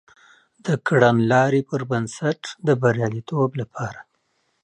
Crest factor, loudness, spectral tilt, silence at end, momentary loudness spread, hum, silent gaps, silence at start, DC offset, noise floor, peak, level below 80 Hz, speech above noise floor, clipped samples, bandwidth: 20 dB; -21 LUFS; -6.5 dB/octave; 0.6 s; 13 LU; none; none; 0.65 s; under 0.1%; -69 dBFS; -2 dBFS; -60 dBFS; 49 dB; under 0.1%; 9.8 kHz